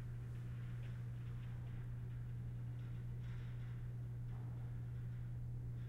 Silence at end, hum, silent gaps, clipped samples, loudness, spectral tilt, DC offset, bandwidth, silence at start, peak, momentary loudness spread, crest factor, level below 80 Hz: 0 s; none; none; under 0.1%; -48 LUFS; -8.5 dB/octave; under 0.1%; 4.1 kHz; 0 s; -38 dBFS; 1 LU; 8 dB; -56 dBFS